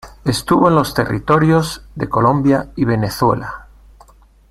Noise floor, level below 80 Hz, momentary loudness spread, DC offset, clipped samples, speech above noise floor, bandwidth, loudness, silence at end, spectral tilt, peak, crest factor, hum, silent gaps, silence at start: -46 dBFS; -40 dBFS; 11 LU; under 0.1%; under 0.1%; 31 dB; 16 kHz; -16 LUFS; 0.9 s; -6.5 dB/octave; 0 dBFS; 16 dB; none; none; 0.05 s